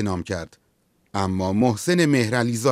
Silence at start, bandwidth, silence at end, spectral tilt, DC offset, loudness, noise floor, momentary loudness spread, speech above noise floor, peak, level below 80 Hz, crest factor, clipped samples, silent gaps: 0 s; 16 kHz; 0 s; -5.5 dB/octave; under 0.1%; -22 LUFS; -65 dBFS; 13 LU; 44 dB; -6 dBFS; -58 dBFS; 16 dB; under 0.1%; none